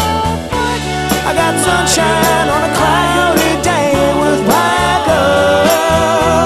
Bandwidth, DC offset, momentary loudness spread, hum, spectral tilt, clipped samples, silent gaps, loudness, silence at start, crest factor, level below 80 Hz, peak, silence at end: 14 kHz; under 0.1%; 5 LU; none; -4 dB/octave; under 0.1%; none; -12 LUFS; 0 s; 12 dB; -32 dBFS; 0 dBFS; 0 s